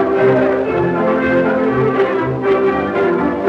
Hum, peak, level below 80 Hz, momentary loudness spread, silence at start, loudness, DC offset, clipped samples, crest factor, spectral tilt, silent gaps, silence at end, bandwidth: none; -2 dBFS; -46 dBFS; 3 LU; 0 s; -15 LUFS; under 0.1%; under 0.1%; 12 dB; -8.5 dB/octave; none; 0 s; 6 kHz